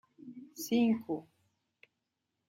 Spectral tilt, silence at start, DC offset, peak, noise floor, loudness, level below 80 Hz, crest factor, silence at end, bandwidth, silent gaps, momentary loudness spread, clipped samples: -5 dB/octave; 0.25 s; under 0.1%; -18 dBFS; -85 dBFS; -33 LUFS; -80 dBFS; 18 dB; 1.25 s; 16 kHz; none; 21 LU; under 0.1%